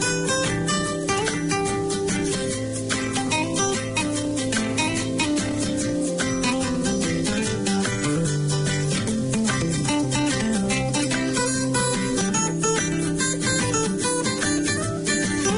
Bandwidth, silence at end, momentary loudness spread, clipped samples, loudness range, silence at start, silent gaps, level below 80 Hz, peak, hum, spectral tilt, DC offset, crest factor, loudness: 11 kHz; 0 s; 3 LU; under 0.1%; 2 LU; 0 s; none; -44 dBFS; -10 dBFS; none; -4 dB/octave; under 0.1%; 14 dB; -23 LUFS